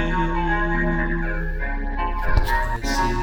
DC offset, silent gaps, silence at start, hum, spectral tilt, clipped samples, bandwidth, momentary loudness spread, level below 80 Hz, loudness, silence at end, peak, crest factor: under 0.1%; none; 0 s; none; -5.5 dB/octave; under 0.1%; 17 kHz; 6 LU; -24 dBFS; -24 LUFS; 0 s; -4 dBFS; 16 dB